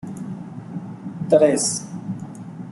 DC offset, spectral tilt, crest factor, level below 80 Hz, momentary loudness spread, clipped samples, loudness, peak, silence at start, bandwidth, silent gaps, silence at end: under 0.1%; -4.5 dB/octave; 20 dB; -64 dBFS; 18 LU; under 0.1%; -21 LUFS; -4 dBFS; 0 s; 12 kHz; none; 0 s